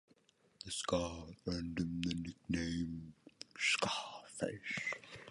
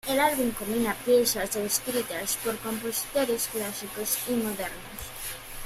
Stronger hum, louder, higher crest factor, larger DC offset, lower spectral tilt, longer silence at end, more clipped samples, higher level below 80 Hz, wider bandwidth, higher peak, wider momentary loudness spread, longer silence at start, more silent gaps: neither; second, -39 LUFS vs -28 LUFS; about the same, 20 dB vs 18 dB; neither; first, -4 dB/octave vs -2.5 dB/octave; about the same, 0 s vs 0 s; neither; second, -58 dBFS vs -52 dBFS; second, 11.5 kHz vs 16 kHz; second, -20 dBFS vs -10 dBFS; about the same, 14 LU vs 12 LU; first, 0.6 s vs 0.05 s; neither